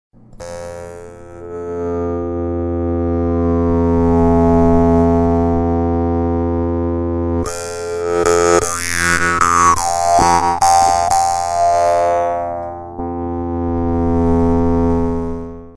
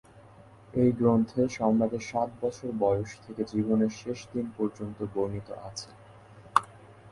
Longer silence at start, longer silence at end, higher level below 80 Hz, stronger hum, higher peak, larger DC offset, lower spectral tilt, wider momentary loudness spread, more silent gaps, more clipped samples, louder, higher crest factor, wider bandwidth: first, 0.35 s vs 0.15 s; about the same, 0 s vs 0 s; first, -30 dBFS vs -58 dBFS; neither; about the same, 0 dBFS vs -2 dBFS; neither; second, -5.5 dB/octave vs -7 dB/octave; about the same, 14 LU vs 14 LU; neither; neither; first, -15 LUFS vs -29 LUFS; second, 16 dB vs 26 dB; about the same, 11 kHz vs 11.5 kHz